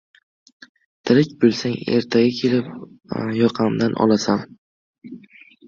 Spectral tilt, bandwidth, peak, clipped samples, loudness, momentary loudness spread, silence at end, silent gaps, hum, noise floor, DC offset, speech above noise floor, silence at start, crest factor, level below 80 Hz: -6 dB/octave; 7.4 kHz; -2 dBFS; under 0.1%; -19 LUFS; 21 LU; 0.5 s; 4.58-4.94 s; none; -48 dBFS; under 0.1%; 29 dB; 1.05 s; 18 dB; -58 dBFS